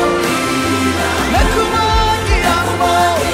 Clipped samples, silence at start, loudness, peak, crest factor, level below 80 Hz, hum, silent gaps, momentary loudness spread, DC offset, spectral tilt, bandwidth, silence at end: under 0.1%; 0 s; -14 LUFS; -2 dBFS; 12 dB; -22 dBFS; none; none; 2 LU; under 0.1%; -4 dB/octave; 16 kHz; 0 s